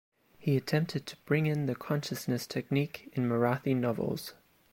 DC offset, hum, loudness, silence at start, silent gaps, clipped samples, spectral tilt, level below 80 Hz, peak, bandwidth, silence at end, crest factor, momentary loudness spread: under 0.1%; none; -32 LUFS; 0.4 s; none; under 0.1%; -6.5 dB/octave; -68 dBFS; -16 dBFS; 16.5 kHz; 0.4 s; 16 dB; 7 LU